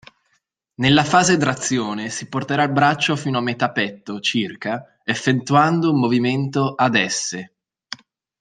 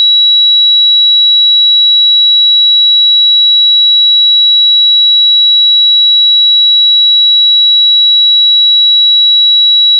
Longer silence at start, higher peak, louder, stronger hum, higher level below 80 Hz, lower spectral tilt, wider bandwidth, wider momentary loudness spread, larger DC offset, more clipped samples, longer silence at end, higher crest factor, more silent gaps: first, 0.8 s vs 0 s; about the same, -2 dBFS vs -4 dBFS; second, -19 LUFS vs -3 LUFS; neither; first, -58 dBFS vs under -90 dBFS; first, -4.5 dB/octave vs 14 dB/octave; first, 10 kHz vs 4.2 kHz; first, 12 LU vs 0 LU; neither; neither; first, 0.45 s vs 0 s; first, 18 dB vs 4 dB; neither